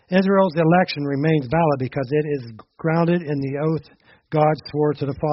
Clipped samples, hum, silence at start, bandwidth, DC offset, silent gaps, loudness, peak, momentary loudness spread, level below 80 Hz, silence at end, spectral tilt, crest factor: under 0.1%; none; 0.1 s; 5.8 kHz; under 0.1%; none; -21 LUFS; -4 dBFS; 9 LU; -54 dBFS; 0 s; -6.5 dB/octave; 16 dB